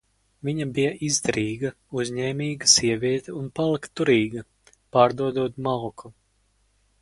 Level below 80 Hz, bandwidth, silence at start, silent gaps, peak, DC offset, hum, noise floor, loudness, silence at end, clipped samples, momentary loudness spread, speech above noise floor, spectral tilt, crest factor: -58 dBFS; 11.5 kHz; 0.45 s; none; -2 dBFS; under 0.1%; none; -66 dBFS; -23 LUFS; 0.9 s; under 0.1%; 13 LU; 43 dB; -3.5 dB/octave; 22 dB